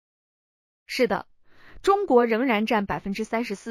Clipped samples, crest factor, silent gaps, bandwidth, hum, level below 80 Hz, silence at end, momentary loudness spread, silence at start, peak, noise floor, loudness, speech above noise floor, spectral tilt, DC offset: under 0.1%; 18 dB; none; 15 kHz; none; -54 dBFS; 0 s; 10 LU; 0.9 s; -6 dBFS; -47 dBFS; -24 LUFS; 24 dB; -5.5 dB/octave; under 0.1%